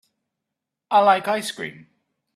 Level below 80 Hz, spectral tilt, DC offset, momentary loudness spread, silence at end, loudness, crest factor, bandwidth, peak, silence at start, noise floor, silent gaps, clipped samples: -74 dBFS; -3.5 dB/octave; under 0.1%; 16 LU; 0.65 s; -20 LUFS; 20 dB; 14 kHz; -4 dBFS; 0.9 s; -84 dBFS; none; under 0.1%